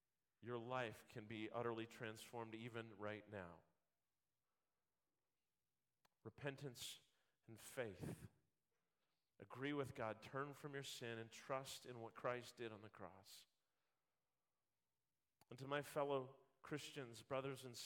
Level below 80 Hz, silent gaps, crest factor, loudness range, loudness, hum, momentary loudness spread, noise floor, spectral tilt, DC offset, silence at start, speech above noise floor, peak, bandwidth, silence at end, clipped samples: -86 dBFS; none; 24 dB; 9 LU; -52 LUFS; none; 14 LU; under -90 dBFS; -4.5 dB/octave; under 0.1%; 0.4 s; over 39 dB; -30 dBFS; 17 kHz; 0 s; under 0.1%